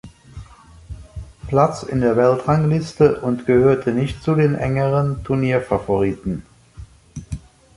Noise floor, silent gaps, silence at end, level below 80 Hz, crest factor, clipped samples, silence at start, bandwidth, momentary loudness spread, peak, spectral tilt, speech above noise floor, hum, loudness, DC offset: -42 dBFS; none; 0.4 s; -40 dBFS; 18 dB; under 0.1%; 0.05 s; 11.5 kHz; 20 LU; -2 dBFS; -8 dB/octave; 25 dB; none; -18 LUFS; under 0.1%